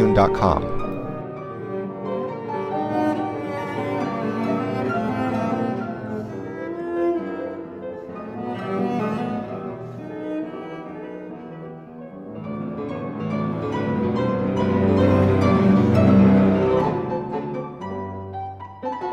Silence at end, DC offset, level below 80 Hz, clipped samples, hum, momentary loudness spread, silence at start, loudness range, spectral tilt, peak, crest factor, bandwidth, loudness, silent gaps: 0 s; under 0.1%; -44 dBFS; under 0.1%; none; 17 LU; 0 s; 13 LU; -9 dB/octave; -4 dBFS; 18 dB; 8.4 kHz; -23 LUFS; none